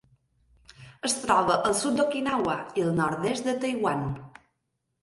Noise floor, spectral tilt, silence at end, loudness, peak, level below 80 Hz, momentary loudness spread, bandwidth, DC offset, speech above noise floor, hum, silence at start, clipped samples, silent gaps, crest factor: -79 dBFS; -4.5 dB/octave; 0.75 s; -26 LUFS; -8 dBFS; -58 dBFS; 7 LU; 12 kHz; under 0.1%; 53 dB; none; 0.8 s; under 0.1%; none; 20 dB